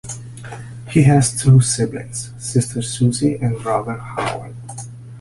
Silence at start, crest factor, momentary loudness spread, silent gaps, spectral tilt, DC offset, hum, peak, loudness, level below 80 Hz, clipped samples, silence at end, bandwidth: 0.05 s; 16 dB; 20 LU; none; -5.5 dB/octave; under 0.1%; none; -2 dBFS; -18 LUFS; -44 dBFS; under 0.1%; 0 s; 11.5 kHz